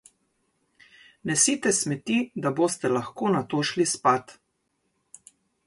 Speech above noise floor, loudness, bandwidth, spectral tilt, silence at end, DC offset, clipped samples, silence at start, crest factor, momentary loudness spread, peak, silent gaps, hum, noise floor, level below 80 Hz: 50 dB; -24 LUFS; 12 kHz; -3.5 dB/octave; 1.35 s; under 0.1%; under 0.1%; 1.25 s; 20 dB; 6 LU; -8 dBFS; none; none; -75 dBFS; -68 dBFS